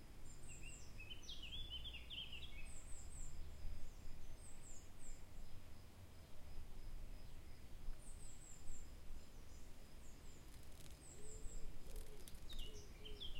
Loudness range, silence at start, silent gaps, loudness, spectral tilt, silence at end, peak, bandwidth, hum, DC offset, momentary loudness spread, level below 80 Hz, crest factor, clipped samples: 7 LU; 0 s; none; -57 LUFS; -3 dB/octave; 0 s; -34 dBFS; 16 kHz; none; under 0.1%; 11 LU; -54 dBFS; 14 dB; under 0.1%